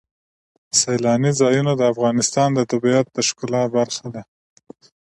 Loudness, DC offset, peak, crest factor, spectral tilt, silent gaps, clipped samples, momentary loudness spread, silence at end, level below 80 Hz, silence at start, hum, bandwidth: -18 LUFS; under 0.1%; -2 dBFS; 18 dB; -4.5 dB/octave; none; under 0.1%; 6 LU; 0.9 s; -62 dBFS; 0.75 s; none; 11.5 kHz